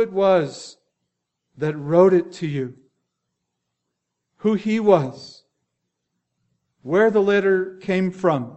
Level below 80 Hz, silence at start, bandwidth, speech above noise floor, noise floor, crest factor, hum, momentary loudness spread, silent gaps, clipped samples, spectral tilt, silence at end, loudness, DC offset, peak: -66 dBFS; 0 s; 8.2 kHz; 60 dB; -79 dBFS; 20 dB; 60 Hz at -55 dBFS; 15 LU; none; under 0.1%; -7 dB/octave; 0 s; -20 LUFS; under 0.1%; -2 dBFS